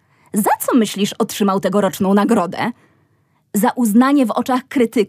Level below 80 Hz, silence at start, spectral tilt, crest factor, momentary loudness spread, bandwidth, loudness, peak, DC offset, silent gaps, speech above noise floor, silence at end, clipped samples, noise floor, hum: -66 dBFS; 0.35 s; -5 dB/octave; 14 dB; 7 LU; 16 kHz; -17 LUFS; -2 dBFS; under 0.1%; none; 45 dB; 0 s; under 0.1%; -60 dBFS; none